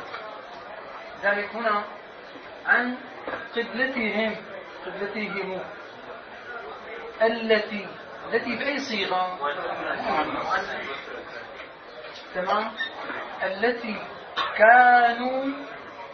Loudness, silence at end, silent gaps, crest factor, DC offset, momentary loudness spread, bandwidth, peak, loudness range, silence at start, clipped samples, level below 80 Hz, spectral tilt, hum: -25 LUFS; 0 s; none; 24 dB; under 0.1%; 17 LU; 6.6 kHz; -2 dBFS; 8 LU; 0 s; under 0.1%; -64 dBFS; -4.5 dB/octave; none